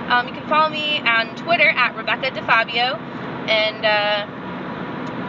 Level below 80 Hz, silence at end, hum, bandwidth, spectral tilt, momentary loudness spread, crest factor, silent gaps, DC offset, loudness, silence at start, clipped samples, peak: -56 dBFS; 0 s; none; 7.6 kHz; -5 dB/octave; 14 LU; 18 dB; none; under 0.1%; -18 LUFS; 0 s; under 0.1%; -2 dBFS